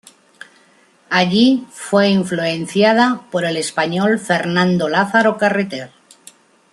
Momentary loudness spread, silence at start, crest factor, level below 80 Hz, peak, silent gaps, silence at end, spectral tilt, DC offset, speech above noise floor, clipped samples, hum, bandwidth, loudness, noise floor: 7 LU; 1.1 s; 16 dB; -62 dBFS; 0 dBFS; none; 0.85 s; -5 dB/octave; under 0.1%; 37 dB; under 0.1%; none; 12 kHz; -16 LUFS; -53 dBFS